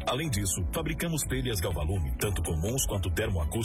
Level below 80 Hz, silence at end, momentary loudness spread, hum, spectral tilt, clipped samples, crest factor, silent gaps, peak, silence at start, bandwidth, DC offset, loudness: -36 dBFS; 0 s; 2 LU; none; -4.5 dB/octave; under 0.1%; 14 dB; none; -16 dBFS; 0 s; 16 kHz; under 0.1%; -30 LUFS